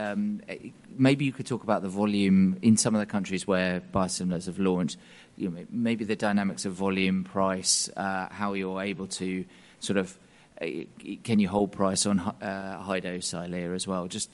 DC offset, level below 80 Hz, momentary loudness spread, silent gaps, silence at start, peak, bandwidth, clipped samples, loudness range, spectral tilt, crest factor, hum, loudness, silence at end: under 0.1%; -62 dBFS; 12 LU; none; 0 s; -8 dBFS; 11.5 kHz; under 0.1%; 5 LU; -4.5 dB/octave; 20 dB; none; -28 LUFS; 0.1 s